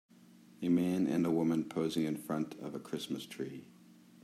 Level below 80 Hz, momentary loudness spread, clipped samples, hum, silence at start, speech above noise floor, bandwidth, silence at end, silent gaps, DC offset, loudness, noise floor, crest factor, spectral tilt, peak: -78 dBFS; 12 LU; under 0.1%; none; 0.6 s; 25 dB; 14.5 kHz; 0.3 s; none; under 0.1%; -35 LUFS; -60 dBFS; 16 dB; -6.5 dB/octave; -20 dBFS